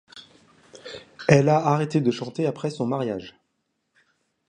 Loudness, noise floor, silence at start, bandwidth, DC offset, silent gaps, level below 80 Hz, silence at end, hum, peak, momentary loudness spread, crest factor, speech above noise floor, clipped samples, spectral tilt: -23 LUFS; -75 dBFS; 0.15 s; 9.8 kHz; under 0.1%; none; -60 dBFS; 1.2 s; none; -2 dBFS; 22 LU; 24 dB; 53 dB; under 0.1%; -7 dB/octave